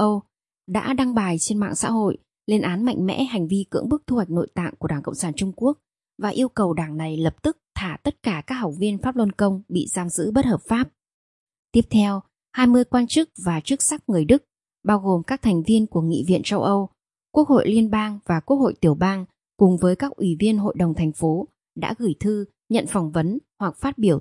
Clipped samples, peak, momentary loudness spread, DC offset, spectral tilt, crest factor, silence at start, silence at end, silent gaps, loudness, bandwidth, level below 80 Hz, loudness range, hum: under 0.1%; -2 dBFS; 9 LU; under 0.1%; -5.5 dB/octave; 18 dB; 0 s; 0 s; 11.14-11.47 s, 11.59-11.63 s; -22 LUFS; 11.5 kHz; -48 dBFS; 5 LU; none